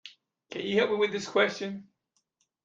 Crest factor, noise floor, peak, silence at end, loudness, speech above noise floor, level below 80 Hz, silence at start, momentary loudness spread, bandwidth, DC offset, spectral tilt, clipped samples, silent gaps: 20 dB; -76 dBFS; -12 dBFS; 0.85 s; -28 LUFS; 48 dB; -74 dBFS; 0.05 s; 14 LU; 7.8 kHz; under 0.1%; -4 dB/octave; under 0.1%; none